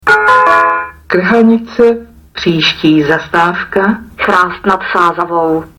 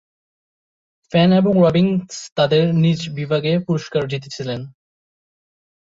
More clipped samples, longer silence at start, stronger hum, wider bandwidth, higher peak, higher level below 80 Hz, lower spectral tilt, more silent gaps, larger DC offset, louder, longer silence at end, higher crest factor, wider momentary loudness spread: neither; second, 0.05 s vs 1.1 s; neither; first, 16 kHz vs 7.6 kHz; first, 0 dBFS vs -4 dBFS; first, -42 dBFS vs -54 dBFS; second, -5.5 dB/octave vs -7 dB/octave; second, none vs 2.32-2.36 s; neither; first, -10 LUFS vs -18 LUFS; second, 0.1 s vs 1.25 s; second, 10 dB vs 16 dB; second, 8 LU vs 13 LU